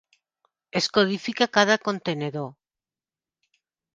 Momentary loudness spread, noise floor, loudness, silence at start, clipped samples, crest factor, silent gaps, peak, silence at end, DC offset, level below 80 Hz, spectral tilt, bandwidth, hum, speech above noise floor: 11 LU; under -90 dBFS; -23 LUFS; 0.75 s; under 0.1%; 24 dB; none; -2 dBFS; 1.4 s; under 0.1%; -68 dBFS; -4 dB/octave; 9.8 kHz; none; over 67 dB